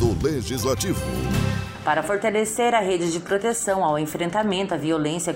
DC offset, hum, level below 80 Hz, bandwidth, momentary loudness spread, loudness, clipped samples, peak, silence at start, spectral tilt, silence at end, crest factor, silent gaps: under 0.1%; none; -40 dBFS; 16 kHz; 4 LU; -23 LUFS; under 0.1%; -8 dBFS; 0 s; -4.5 dB/octave; 0 s; 14 dB; none